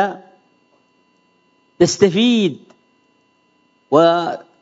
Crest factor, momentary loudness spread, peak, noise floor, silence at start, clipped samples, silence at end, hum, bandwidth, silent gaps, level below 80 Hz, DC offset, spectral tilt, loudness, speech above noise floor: 20 dB; 14 LU; 0 dBFS; -60 dBFS; 0 s; under 0.1%; 0.25 s; none; 8 kHz; none; -60 dBFS; under 0.1%; -5 dB/octave; -16 LUFS; 45 dB